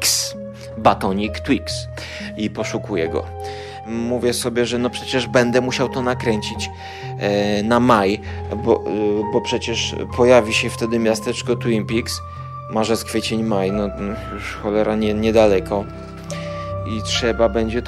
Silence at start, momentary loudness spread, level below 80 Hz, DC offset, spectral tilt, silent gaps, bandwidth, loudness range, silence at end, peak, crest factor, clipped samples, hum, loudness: 0 s; 13 LU; -40 dBFS; under 0.1%; -4.5 dB/octave; none; 16 kHz; 4 LU; 0 s; 0 dBFS; 20 dB; under 0.1%; none; -20 LUFS